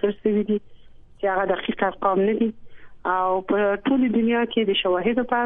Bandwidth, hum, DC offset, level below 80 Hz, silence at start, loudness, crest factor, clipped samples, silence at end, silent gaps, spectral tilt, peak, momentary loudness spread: 3.9 kHz; none; under 0.1%; -52 dBFS; 0.05 s; -22 LUFS; 16 dB; under 0.1%; 0 s; none; -9.5 dB/octave; -6 dBFS; 5 LU